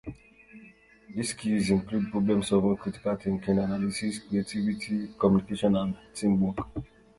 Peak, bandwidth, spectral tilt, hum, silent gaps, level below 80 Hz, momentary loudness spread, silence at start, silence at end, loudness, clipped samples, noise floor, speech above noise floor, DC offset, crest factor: -8 dBFS; 11.5 kHz; -6.5 dB/octave; none; none; -52 dBFS; 9 LU; 0.05 s; 0.35 s; -28 LUFS; under 0.1%; -55 dBFS; 27 dB; under 0.1%; 20 dB